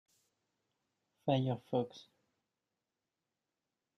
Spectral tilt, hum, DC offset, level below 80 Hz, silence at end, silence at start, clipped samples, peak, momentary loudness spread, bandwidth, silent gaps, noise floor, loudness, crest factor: -8 dB/octave; none; under 0.1%; -80 dBFS; 1.95 s; 1.25 s; under 0.1%; -18 dBFS; 11 LU; 6.4 kHz; none; -90 dBFS; -37 LUFS; 24 dB